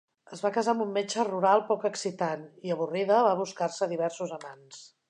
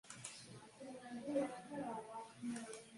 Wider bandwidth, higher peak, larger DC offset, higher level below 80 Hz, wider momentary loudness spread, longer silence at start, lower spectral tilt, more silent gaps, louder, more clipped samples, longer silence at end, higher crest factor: about the same, 10.5 kHz vs 11.5 kHz; first, -10 dBFS vs -28 dBFS; neither; about the same, -84 dBFS vs -84 dBFS; about the same, 15 LU vs 13 LU; first, 0.3 s vs 0.05 s; about the same, -4.5 dB/octave vs -4.5 dB/octave; neither; first, -28 LUFS vs -47 LUFS; neither; first, 0.25 s vs 0 s; about the same, 20 dB vs 20 dB